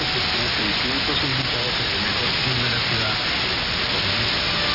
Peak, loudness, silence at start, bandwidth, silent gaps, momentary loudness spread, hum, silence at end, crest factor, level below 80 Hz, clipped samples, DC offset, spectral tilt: -10 dBFS; -20 LUFS; 0 s; 5.8 kHz; none; 1 LU; none; 0 s; 12 dB; -40 dBFS; under 0.1%; under 0.1%; -4 dB/octave